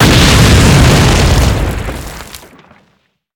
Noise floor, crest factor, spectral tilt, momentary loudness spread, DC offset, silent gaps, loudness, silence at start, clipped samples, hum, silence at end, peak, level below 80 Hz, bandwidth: -57 dBFS; 10 dB; -4.5 dB/octave; 20 LU; under 0.1%; none; -8 LUFS; 0 s; under 0.1%; none; 1 s; 0 dBFS; -16 dBFS; 19 kHz